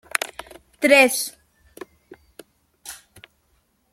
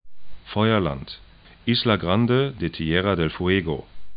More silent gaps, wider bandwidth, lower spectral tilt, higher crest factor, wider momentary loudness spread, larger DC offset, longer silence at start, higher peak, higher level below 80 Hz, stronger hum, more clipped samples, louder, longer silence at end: neither; first, 16.5 kHz vs 5.2 kHz; second, -1 dB/octave vs -11 dB/octave; first, 24 dB vs 18 dB; first, 29 LU vs 12 LU; neither; about the same, 0.15 s vs 0.05 s; first, 0 dBFS vs -4 dBFS; second, -62 dBFS vs -44 dBFS; neither; neither; first, -18 LUFS vs -23 LUFS; first, 0.95 s vs 0 s